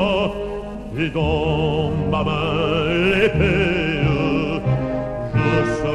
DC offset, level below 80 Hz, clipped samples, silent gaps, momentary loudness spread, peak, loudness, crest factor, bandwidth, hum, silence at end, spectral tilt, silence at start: under 0.1%; -34 dBFS; under 0.1%; none; 8 LU; -4 dBFS; -20 LUFS; 16 dB; 10.5 kHz; none; 0 s; -7 dB/octave; 0 s